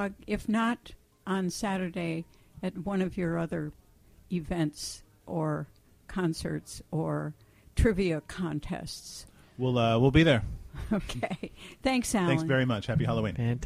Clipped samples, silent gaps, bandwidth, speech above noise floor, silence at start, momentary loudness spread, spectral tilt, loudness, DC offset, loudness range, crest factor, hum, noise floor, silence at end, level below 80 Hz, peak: under 0.1%; none; 15.5 kHz; 28 dB; 0 s; 14 LU; -6 dB/octave; -30 LUFS; under 0.1%; 7 LU; 22 dB; none; -58 dBFS; 0 s; -44 dBFS; -8 dBFS